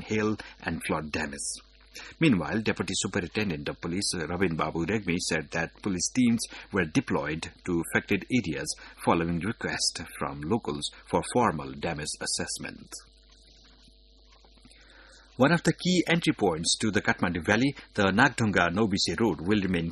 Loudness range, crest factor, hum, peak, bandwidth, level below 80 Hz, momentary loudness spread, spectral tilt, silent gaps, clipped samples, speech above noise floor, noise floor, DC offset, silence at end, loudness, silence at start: 7 LU; 24 dB; none; -6 dBFS; 12 kHz; -52 dBFS; 10 LU; -4.5 dB/octave; none; under 0.1%; 29 dB; -57 dBFS; under 0.1%; 0 s; -28 LUFS; 0 s